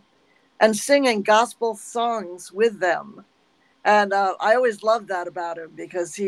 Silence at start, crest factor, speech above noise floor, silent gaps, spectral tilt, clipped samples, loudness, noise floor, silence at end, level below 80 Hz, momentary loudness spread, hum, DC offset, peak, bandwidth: 0.6 s; 20 dB; 41 dB; none; -3 dB/octave; under 0.1%; -21 LUFS; -62 dBFS; 0 s; -74 dBFS; 12 LU; none; under 0.1%; -2 dBFS; 15.5 kHz